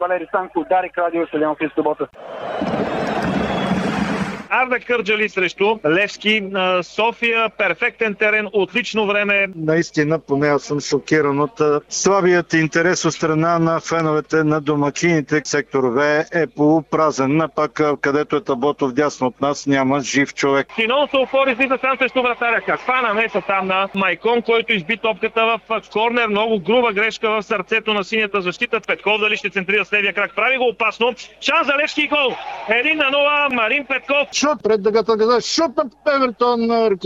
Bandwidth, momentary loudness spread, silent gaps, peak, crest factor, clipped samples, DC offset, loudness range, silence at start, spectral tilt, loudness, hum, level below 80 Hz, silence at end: 8.8 kHz; 5 LU; none; -4 dBFS; 14 dB; under 0.1%; under 0.1%; 2 LU; 0 s; -4.5 dB/octave; -18 LUFS; none; -54 dBFS; 0 s